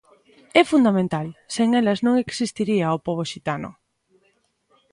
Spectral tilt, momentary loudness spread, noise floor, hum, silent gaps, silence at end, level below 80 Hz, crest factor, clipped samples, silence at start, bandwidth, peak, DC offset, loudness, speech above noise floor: -5.5 dB/octave; 11 LU; -66 dBFS; none; none; 1.2 s; -60 dBFS; 22 dB; under 0.1%; 0.55 s; 11.5 kHz; 0 dBFS; under 0.1%; -21 LUFS; 45 dB